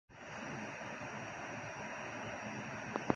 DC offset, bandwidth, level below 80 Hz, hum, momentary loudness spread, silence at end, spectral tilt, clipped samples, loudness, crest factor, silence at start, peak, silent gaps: under 0.1%; 10.5 kHz; -70 dBFS; none; 2 LU; 0 s; -4.5 dB/octave; under 0.1%; -44 LUFS; 30 dB; 0.1 s; -12 dBFS; none